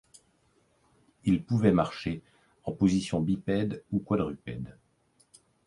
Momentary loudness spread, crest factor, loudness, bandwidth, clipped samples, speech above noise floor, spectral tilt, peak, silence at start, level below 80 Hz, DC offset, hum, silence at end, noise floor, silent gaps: 15 LU; 22 dB; -29 LUFS; 11.5 kHz; under 0.1%; 40 dB; -7.5 dB/octave; -8 dBFS; 1.25 s; -54 dBFS; under 0.1%; none; 1 s; -68 dBFS; none